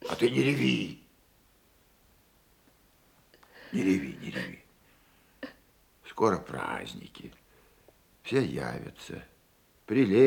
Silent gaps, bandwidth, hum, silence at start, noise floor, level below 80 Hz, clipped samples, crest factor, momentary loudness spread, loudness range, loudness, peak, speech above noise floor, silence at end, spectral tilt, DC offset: none; 19 kHz; none; 0 s; -64 dBFS; -64 dBFS; under 0.1%; 22 dB; 22 LU; 4 LU; -30 LUFS; -10 dBFS; 36 dB; 0 s; -6 dB/octave; under 0.1%